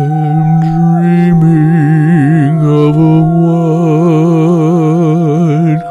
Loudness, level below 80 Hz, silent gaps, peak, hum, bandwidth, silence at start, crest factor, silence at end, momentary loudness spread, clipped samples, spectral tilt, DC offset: -9 LUFS; -40 dBFS; none; 0 dBFS; none; 7 kHz; 0 s; 8 dB; 0 s; 2 LU; under 0.1%; -9.5 dB/octave; under 0.1%